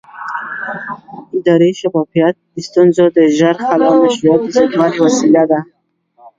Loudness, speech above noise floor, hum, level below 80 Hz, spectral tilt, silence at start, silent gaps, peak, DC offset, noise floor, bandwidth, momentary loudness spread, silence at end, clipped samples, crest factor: -12 LUFS; 37 dB; none; -58 dBFS; -6 dB/octave; 0.15 s; none; 0 dBFS; under 0.1%; -48 dBFS; 7.8 kHz; 13 LU; 0.75 s; under 0.1%; 12 dB